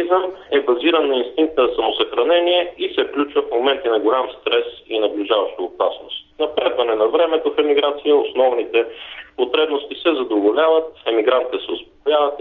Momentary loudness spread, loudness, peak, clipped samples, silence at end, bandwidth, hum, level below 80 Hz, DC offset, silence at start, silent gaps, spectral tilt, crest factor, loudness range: 8 LU; -18 LUFS; -2 dBFS; under 0.1%; 0 s; 4.2 kHz; none; -56 dBFS; under 0.1%; 0 s; none; -6 dB/octave; 16 dB; 2 LU